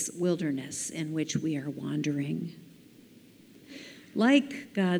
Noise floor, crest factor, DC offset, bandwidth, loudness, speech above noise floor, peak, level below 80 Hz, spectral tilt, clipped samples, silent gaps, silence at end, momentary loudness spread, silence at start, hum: -55 dBFS; 20 dB; under 0.1%; over 20 kHz; -30 LUFS; 26 dB; -10 dBFS; -74 dBFS; -5 dB/octave; under 0.1%; none; 0 s; 22 LU; 0 s; none